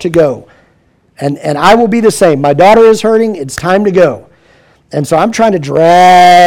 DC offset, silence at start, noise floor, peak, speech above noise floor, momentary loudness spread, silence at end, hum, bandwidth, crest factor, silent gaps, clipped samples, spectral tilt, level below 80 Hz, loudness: under 0.1%; 0 s; -50 dBFS; 0 dBFS; 44 dB; 14 LU; 0 s; none; 16.5 kHz; 8 dB; none; 2%; -5 dB/octave; -42 dBFS; -8 LUFS